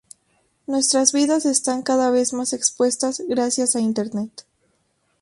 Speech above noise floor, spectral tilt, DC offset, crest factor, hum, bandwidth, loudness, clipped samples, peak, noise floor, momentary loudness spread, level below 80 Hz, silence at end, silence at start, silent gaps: 47 dB; -2.5 dB/octave; under 0.1%; 20 dB; none; 11.5 kHz; -20 LUFS; under 0.1%; -2 dBFS; -67 dBFS; 10 LU; -66 dBFS; 0.95 s; 0.7 s; none